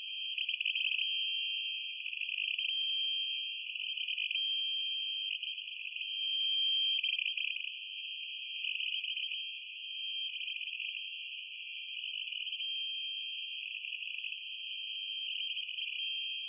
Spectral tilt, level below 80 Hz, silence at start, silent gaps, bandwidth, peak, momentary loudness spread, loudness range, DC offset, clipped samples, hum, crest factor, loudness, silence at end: 13.5 dB/octave; under -90 dBFS; 0 s; none; 3.6 kHz; -22 dBFS; 9 LU; 5 LU; under 0.1%; under 0.1%; none; 14 dB; -34 LUFS; 0 s